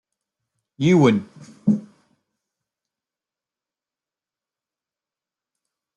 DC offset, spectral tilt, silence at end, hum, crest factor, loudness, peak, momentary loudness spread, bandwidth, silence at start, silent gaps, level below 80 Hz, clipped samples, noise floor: under 0.1%; -7.5 dB/octave; 4.15 s; none; 22 dB; -20 LUFS; -4 dBFS; 10 LU; 9 kHz; 0.8 s; none; -66 dBFS; under 0.1%; under -90 dBFS